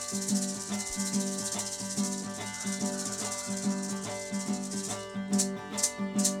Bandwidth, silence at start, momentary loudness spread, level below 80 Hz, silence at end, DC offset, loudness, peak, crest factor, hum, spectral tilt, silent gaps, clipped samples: 17 kHz; 0 s; 6 LU; -64 dBFS; 0 s; under 0.1%; -32 LUFS; -10 dBFS; 22 dB; none; -3 dB/octave; none; under 0.1%